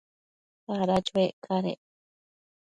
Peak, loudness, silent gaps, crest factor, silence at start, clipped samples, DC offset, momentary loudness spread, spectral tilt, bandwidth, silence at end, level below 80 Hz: -12 dBFS; -28 LUFS; 1.33-1.42 s; 20 dB; 0.7 s; under 0.1%; under 0.1%; 14 LU; -6.5 dB/octave; 10.5 kHz; 1.05 s; -62 dBFS